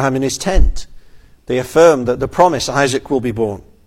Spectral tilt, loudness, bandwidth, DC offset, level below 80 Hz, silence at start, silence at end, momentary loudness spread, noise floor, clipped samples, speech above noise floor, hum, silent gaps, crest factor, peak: -5 dB/octave; -15 LUFS; 16 kHz; under 0.1%; -22 dBFS; 0 s; 0.25 s; 10 LU; -40 dBFS; under 0.1%; 26 dB; none; none; 14 dB; 0 dBFS